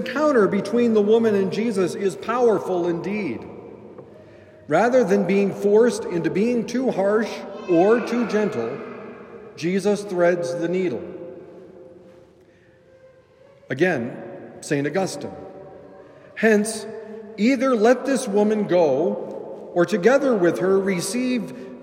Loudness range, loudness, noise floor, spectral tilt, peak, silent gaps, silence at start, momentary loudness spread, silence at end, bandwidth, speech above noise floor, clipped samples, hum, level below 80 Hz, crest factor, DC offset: 7 LU; -21 LUFS; -53 dBFS; -6 dB/octave; -2 dBFS; none; 0 s; 19 LU; 0 s; 16 kHz; 33 dB; under 0.1%; none; -68 dBFS; 18 dB; under 0.1%